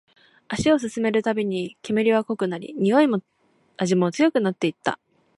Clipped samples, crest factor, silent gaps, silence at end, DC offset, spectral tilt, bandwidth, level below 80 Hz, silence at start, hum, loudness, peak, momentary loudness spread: under 0.1%; 18 dB; none; 0.45 s; under 0.1%; -6 dB/octave; 11.5 kHz; -56 dBFS; 0.5 s; none; -23 LUFS; -6 dBFS; 9 LU